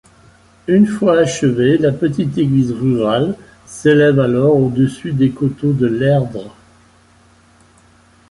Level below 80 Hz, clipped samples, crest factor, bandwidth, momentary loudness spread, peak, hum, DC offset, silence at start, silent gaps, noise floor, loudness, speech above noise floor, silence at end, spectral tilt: -48 dBFS; under 0.1%; 14 dB; 11.5 kHz; 6 LU; -2 dBFS; none; under 0.1%; 0.7 s; none; -49 dBFS; -15 LUFS; 35 dB; 1.8 s; -7 dB/octave